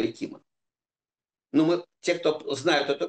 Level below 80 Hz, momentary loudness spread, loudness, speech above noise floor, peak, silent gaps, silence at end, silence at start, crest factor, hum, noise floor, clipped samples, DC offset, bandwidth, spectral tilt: -76 dBFS; 10 LU; -26 LUFS; over 64 dB; -10 dBFS; none; 0 s; 0 s; 18 dB; none; under -90 dBFS; under 0.1%; under 0.1%; 9 kHz; -4.5 dB/octave